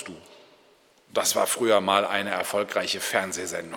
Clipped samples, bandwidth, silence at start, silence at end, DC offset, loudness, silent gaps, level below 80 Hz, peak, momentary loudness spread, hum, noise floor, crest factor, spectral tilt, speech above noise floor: under 0.1%; 19 kHz; 0 s; 0 s; under 0.1%; -24 LUFS; none; -72 dBFS; -6 dBFS; 9 LU; none; -59 dBFS; 22 dB; -2 dB/octave; 34 dB